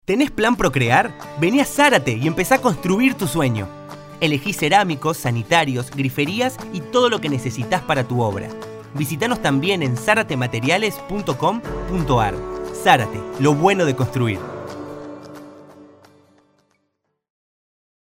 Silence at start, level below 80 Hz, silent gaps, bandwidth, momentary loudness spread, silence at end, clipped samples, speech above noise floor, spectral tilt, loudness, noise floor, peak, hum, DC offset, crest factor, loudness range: 0.1 s; -44 dBFS; none; 16 kHz; 15 LU; 2.15 s; under 0.1%; 54 dB; -5 dB/octave; -19 LUFS; -72 dBFS; 0 dBFS; none; under 0.1%; 20 dB; 5 LU